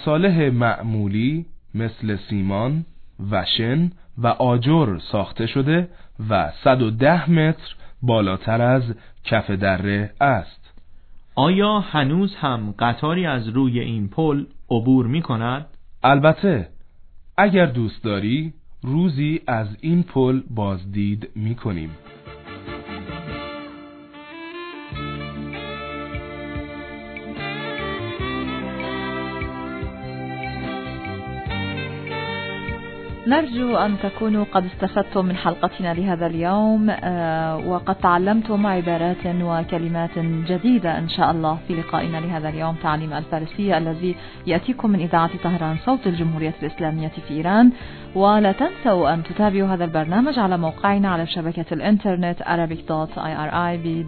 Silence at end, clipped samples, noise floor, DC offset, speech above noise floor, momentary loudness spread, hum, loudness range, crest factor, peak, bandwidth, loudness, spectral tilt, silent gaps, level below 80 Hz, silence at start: 0 s; under 0.1%; -42 dBFS; under 0.1%; 22 dB; 14 LU; none; 9 LU; 20 dB; -2 dBFS; 4.6 kHz; -21 LUFS; -10.5 dB/octave; none; -44 dBFS; 0 s